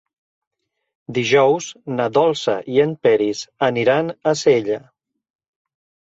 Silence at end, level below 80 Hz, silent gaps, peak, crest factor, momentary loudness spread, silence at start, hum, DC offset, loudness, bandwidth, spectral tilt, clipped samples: 1.25 s; -62 dBFS; none; -4 dBFS; 16 dB; 8 LU; 1.1 s; none; under 0.1%; -18 LUFS; 8 kHz; -5 dB/octave; under 0.1%